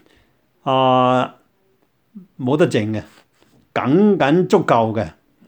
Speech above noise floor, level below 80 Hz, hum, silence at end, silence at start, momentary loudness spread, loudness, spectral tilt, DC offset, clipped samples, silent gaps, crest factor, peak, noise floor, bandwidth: 47 dB; -56 dBFS; none; 0.35 s; 0.65 s; 13 LU; -17 LUFS; -7 dB/octave; under 0.1%; under 0.1%; none; 18 dB; -2 dBFS; -62 dBFS; 19.5 kHz